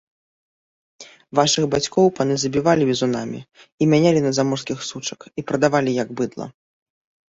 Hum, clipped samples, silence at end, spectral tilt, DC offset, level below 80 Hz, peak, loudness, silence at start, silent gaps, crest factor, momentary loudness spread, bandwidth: none; under 0.1%; 0.85 s; -5 dB/octave; under 0.1%; -58 dBFS; 0 dBFS; -20 LUFS; 1 s; 3.72-3.78 s; 20 dB; 13 LU; 8.4 kHz